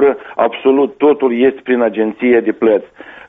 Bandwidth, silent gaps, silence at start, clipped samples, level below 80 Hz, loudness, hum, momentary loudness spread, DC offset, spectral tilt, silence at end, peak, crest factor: 3.8 kHz; none; 0 s; under 0.1%; -56 dBFS; -14 LUFS; none; 4 LU; under 0.1%; -4 dB/octave; 0.1 s; 0 dBFS; 12 dB